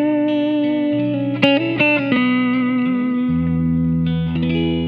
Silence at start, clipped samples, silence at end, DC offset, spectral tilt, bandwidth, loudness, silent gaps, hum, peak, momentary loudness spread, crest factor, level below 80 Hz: 0 s; under 0.1%; 0 s; under 0.1%; -8.5 dB/octave; 6 kHz; -18 LUFS; none; none; 0 dBFS; 4 LU; 18 dB; -40 dBFS